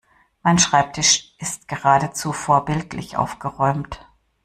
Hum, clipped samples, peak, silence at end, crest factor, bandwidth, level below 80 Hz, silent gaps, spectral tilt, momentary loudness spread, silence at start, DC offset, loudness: none; under 0.1%; -2 dBFS; 0.5 s; 18 dB; 14 kHz; -48 dBFS; none; -3 dB/octave; 12 LU; 0.45 s; under 0.1%; -19 LUFS